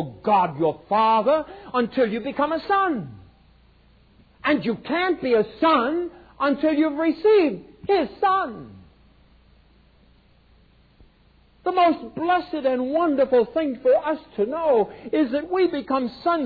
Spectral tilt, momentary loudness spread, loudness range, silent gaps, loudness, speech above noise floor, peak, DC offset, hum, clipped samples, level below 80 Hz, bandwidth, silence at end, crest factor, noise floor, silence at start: -8.5 dB/octave; 7 LU; 7 LU; none; -22 LUFS; 35 dB; -8 dBFS; under 0.1%; none; under 0.1%; -56 dBFS; 5 kHz; 0 s; 16 dB; -57 dBFS; 0 s